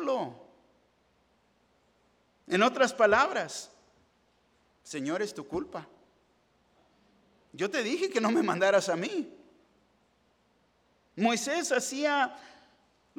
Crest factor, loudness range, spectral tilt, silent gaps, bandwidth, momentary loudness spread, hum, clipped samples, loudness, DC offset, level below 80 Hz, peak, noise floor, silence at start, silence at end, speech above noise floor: 22 dB; 10 LU; -3.5 dB/octave; none; 17 kHz; 17 LU; none; under 0.1%; -29 LUFS; under 0.1%; -70 dBFS; -10 dBFS; -69 dBFS; 0 s; 0.7 s; 41 dB